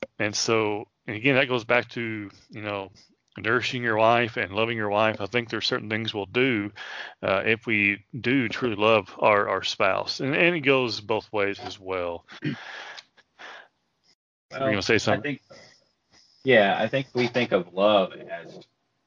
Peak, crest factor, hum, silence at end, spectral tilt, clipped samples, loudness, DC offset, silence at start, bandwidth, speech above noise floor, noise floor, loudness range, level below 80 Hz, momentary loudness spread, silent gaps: -6 dBFS; 20 dB; none; 0.45 s; -4.5 dB/octave; under 0.1%; -24 LUFS; under 0.1%; 0 s; 9.8 kHz; 41 dB; -66 dBFS; 6 LU; -66 dBFS; 15 LU; 14.15-14.49 s